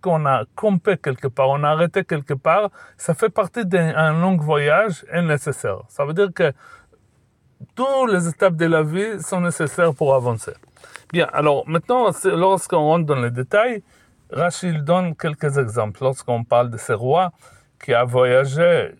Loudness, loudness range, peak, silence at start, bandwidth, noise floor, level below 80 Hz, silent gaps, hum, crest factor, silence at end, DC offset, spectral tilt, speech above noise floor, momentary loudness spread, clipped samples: -19 LUFS; 3 LU; -4 dBFS; 0.05 s; 14 kHz; -59 dBFS; -62 dBFS; none; none; 16 dB; 0.1 s; under 0.1%; -6 dB/octave; 40 dB; 8 LU; under 0.1%